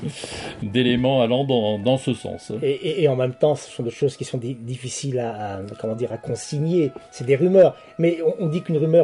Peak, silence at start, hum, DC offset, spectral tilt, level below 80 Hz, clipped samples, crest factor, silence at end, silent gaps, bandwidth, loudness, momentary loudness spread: -4 dBFS; 0 s; none; under 0.1%; -6 dB/octave; -56 dBFS; under 0.1%; 16 dB; 0 s; none; 11 kHz; -22 LUFS; 12 LU